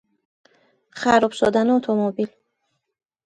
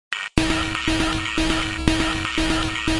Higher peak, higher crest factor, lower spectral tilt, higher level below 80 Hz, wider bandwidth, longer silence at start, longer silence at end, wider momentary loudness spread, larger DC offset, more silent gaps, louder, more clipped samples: about the same, -2 dBFS vs -2 dBFS; about the same, 20 dB vs 20 dB; first, -5.5 dB/octave vs -4 dB/octave; second, -60 dBFS vs -30 dBFS; about the same, 10.5 kHz vs 11.5 kHz; first, 0.95 s vs 0.1 s; first, 1 s vs 0 s; first, 9 LU vs 1 LU; neither; neither; about the same, -20 LUFS vs -22 LUFS; neither